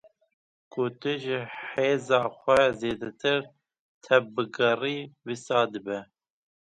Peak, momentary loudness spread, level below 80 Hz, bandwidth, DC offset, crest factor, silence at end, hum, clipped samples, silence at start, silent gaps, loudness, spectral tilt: -6 dBFS; 13 LU; -64 dBFS; 11 kHz; under 0.1%; 22 dB; 0.6 s; none; under 0.1%; 0.75 s; 3.79-4.01 s; -27 LUFS; -5 dB/octave